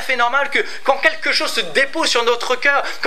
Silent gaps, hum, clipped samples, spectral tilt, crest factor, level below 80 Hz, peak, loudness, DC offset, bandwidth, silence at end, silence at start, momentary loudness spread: none; none; under 0.1%; -0.5 dB/octave; 18 dB; -68 dBFS; 0 dBFS; -16 LUFS; 5%; 15.5 kHz; 0 s; 0 s; 3 LU